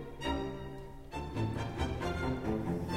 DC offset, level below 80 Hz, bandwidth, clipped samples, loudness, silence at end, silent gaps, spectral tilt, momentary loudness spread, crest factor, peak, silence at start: 0.2%; -46 dBFS; 16 kHz; under 0.1%; -37 LUFS; 0 s; none; -6.5 dB/octave; 9 LU; 16 dB; -22 dBFS; 0 s